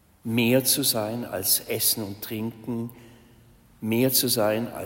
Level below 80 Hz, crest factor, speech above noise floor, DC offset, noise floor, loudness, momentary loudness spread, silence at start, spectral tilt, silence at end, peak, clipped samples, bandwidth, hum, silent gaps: -62 dBFS; 18 dB; 30 dB; under 0.1%; -54 dBFS; -24 LUFS; 12 LU; 0.25 s; -3.5 dB/octave; 0 s; -8 dBFS; under 0.1%; 16.5 kHz; none; none